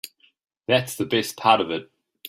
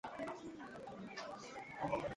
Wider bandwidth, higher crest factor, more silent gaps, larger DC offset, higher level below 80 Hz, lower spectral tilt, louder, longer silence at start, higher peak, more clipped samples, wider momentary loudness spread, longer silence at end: first, 16 kHz vs 11.5 kHz; about the same, 22 dB vs 20 dB; neither; neither; about the same, -66 dBFS vs -70 dBFS; about the same, -4 dB/octave vs -5 dB/octave; first, -22 LUFS vs -47 LUFS; about the same, 0.05 s vs 0.05 s; first, -2 dBFS vs -26 dBFS; neither; first, 15 LU vs 9 LU; about the same, 0 s vs 0 s